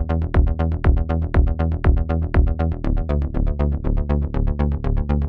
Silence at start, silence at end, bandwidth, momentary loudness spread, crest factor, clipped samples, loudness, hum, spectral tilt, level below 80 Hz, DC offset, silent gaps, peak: 0 s; 0 s; 4.4 kHz; 4 LU; 12 dB; under 0.1%; -21 LUFS; none; -10.5 dB/octave; -20 dBFS; under 0.1%; none; -6 dBFS